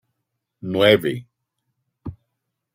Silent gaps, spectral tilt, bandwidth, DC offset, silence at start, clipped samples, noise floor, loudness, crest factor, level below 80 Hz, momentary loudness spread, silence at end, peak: none; -6 dB/octave; 16 kHz; under 0.1%; 0.65 s; under 0.1%; -78 dBFS; -18 LUFS; 22 dB; -58 dBFS; 22 LU; 0.65 s; -2 dBFS